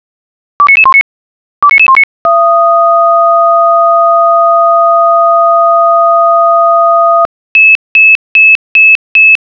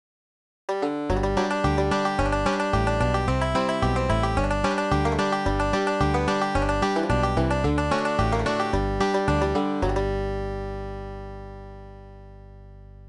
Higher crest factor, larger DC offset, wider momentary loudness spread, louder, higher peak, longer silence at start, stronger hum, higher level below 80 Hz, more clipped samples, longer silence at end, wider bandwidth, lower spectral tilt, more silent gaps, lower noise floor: second, 6 dB vs 16 dB; first, 0.2% vs under 0.1%; second, 4 LU vs 12 LU; first, -5 LUFS vs -24 LUFS; first, 0 dBFS vs -10 dBFS; about the same, 0.6 s vs 0.7 s; second, none vs 50 Hz at -45 dBFS; second, -56 dBFS vs -32 dBFS; neither; first, 0.15 s vs 0 s; second, 5.4 kHz vs 11 kHz; second, -3 dB/octave vs -6 dB/octave; first, 1.01-1.62 s, 2.04-2.25 s, 7.25-7.55 s, 7.75-7.95 s, 8.15-8.35 s, 8.55-8.75 s, 8.95-9.15 s vs none; first, under -90 dBFS vs -44 dBFS